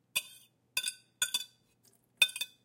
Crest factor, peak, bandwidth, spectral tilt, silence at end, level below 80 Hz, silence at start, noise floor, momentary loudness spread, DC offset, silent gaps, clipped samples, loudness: 28 dB; -10 dBFS; 17 kHz; 3 dB/octave; 0.2 s; -88 dBFS; 0.15 s; -69 dBFS; 13 LU; under 0.1%; none; under 0.1%; -32 LUFS